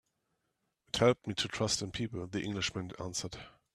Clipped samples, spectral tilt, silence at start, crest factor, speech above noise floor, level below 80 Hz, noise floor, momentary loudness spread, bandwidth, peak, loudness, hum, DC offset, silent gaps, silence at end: under 0.1%; -4 dB/octave; 0.95 s; 24 dB; 48 dB; -62 dBFS; -82 dBFS; 11 LU; 14 kHz; -12 dBFS; -34 LUFS; none; under 0.1%; none; 0.25 s